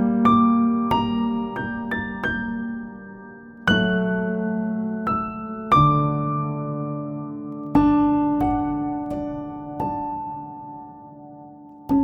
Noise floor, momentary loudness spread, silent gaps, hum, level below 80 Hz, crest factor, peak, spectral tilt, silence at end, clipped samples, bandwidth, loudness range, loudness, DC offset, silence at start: -43 dBFS; 22 LU; none; none; -44 dBFS; 18 dB; -4 dBFS; -8 dB/octave; 0 s; under 0.1%; 6.6 kHz; 5 LU; -23 LUFS; under 0.1%; 0 s